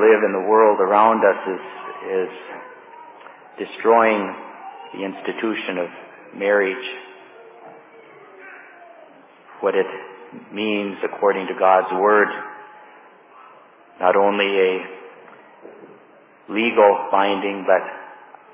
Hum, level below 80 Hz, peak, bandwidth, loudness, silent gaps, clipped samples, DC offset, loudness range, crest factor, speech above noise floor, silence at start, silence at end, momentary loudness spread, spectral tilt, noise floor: none; -80 dBFS; -2 dBFS; 3.9 kHz; -19 LUFS; none; under 0.1%; under 0.1%; 7 LU; 20 dB; 31 dB; 0 s; 0.4 s; 24 LU; -8.5 dB/octave; -50 dBFS